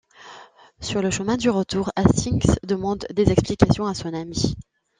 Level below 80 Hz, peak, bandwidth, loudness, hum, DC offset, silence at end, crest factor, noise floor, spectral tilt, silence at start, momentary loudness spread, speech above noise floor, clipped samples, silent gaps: -38 dBFS; -2 dBFS; 9.8 kHz; -22 LUFS; none; under 0.1%; 0.4 s; 20 dB; -47 dBFS; -6 dB/octave; 0.2 s; 9 LU; 26 dB; under 0.1%; none